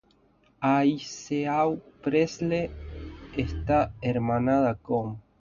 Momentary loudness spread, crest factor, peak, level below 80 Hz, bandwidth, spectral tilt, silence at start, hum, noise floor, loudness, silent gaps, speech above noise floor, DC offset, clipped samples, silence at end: 12 LU; 16 dB; -12 dBFS; -44 dBFS; 7.4 kHz; -7 dB/octave; 0.6 s; none; -63 dBFS; -27 LUFS; none; 37 dB; under 0.1%; under 0.1%; 0.2 s